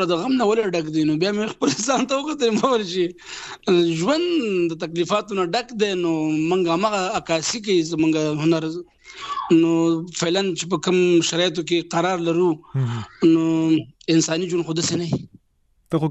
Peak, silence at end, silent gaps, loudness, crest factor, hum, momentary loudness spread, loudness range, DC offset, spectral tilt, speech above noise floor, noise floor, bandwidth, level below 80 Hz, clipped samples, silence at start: -6 dBFS; 0 s; none; -21 LUFS; 16 dB; none; 7 LU; 2 LU; under 0.1%; -5 dB/octave; 43 dB; -63 dBFS; 8.4 kHz; -60 dBFS; under 0.1%; 0 s